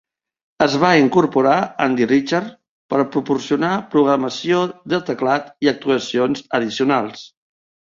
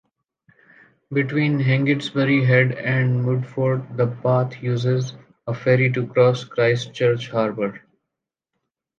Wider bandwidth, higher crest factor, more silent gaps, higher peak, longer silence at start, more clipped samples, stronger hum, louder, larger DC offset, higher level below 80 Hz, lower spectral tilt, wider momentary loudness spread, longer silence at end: about the same, 7.6 kHz vs 7.4 kHz; about the same, 18 dB vs 18 dB; first, 2.69-2.89 s vs none; first, 0 dBFS vs -4 dBFS; second, 0.6 s vs 1.1 s; neither; neither; about the same, -18 LUFS vs -20 LUFS; neither; about the same, -60 dBFS vs -64 dBFS; second, -5.5 dB/octave vs -7.5 dB/octave; about the same, 8 LU vs 7 LU; second, 0.65 s vs 1.2 s